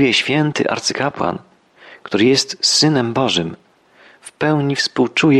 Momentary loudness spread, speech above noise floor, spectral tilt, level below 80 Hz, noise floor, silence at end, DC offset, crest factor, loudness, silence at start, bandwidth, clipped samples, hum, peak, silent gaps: 9 LU; 33 dB; -4 dB/octave; -56 dBFS; -49 dBFS; 0 s; under 0.1%; 14 dB; -16 LUFS; 0 s; 12.5 kHz; under 0.1%; none; -2 dBFS; none